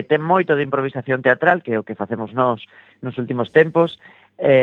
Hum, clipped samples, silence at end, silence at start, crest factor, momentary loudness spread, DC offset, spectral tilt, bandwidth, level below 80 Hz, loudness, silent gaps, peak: none; under 0.1%; 0 s; 0 s; 18 dB; 11 LU; under 0.1%; -8.5 dB/octave; 4.3 kHz; -68 dBFS; -19 LUFS; none; 0 dBFS